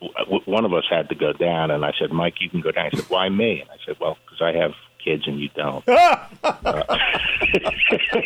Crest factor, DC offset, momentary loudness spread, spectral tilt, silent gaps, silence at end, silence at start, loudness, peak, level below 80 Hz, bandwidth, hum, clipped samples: 16 dB; under 0.1%; 9 LU; -5.5 dB/octave; none; 0 s; 0 s; -20 LUFS; -6 dBFS; -46 dBFS; 15 kHz; none; under 0.1%